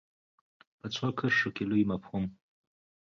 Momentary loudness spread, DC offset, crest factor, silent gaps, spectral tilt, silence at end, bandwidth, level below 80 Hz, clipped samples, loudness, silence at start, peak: 11 LU; under 0.1%; 18 dB; none; -6 dB/octave; 0.8 s; 7.2 kHz; -62 dBFS; under 0.1%; -31 LUFS; 0.85 s; -16 dBFS